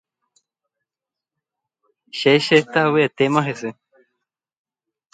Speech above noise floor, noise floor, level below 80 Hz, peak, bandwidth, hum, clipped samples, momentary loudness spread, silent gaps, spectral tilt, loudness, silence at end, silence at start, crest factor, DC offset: 70 dB; -88 dBFS; -68 dBFS; 0 dBFS; 9.2 kHz; none; under 0.1%; 16 LU; none; -5.5 dB/octave; -17 LUFS; 1.4 s; 2.15 s; 22 dB; under 0.1%